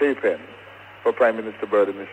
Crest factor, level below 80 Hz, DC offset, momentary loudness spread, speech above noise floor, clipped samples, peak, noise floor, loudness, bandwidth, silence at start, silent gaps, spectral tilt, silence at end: 16 dB; -70 dBFS; under 0.1%; 22 LU; 22 dB; under 0.1%; -6 dBFS; -43 dBFS; -22 LUFS; 8.8 kHz; 0 s; none; -6 dB/octave; 0 s